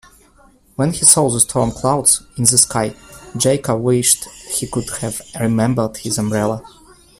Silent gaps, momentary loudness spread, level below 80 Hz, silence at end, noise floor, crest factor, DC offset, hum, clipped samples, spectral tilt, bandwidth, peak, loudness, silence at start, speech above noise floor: none; 12 LU; -44 dBFS; 0.5 s; -50 dBFS; 18 dB; under 0.1%; none; under 0.1%; -3.5 dB/octave; 16 kHz; 0 dBFS; -15 LUFS; 0.8 s; 34 dB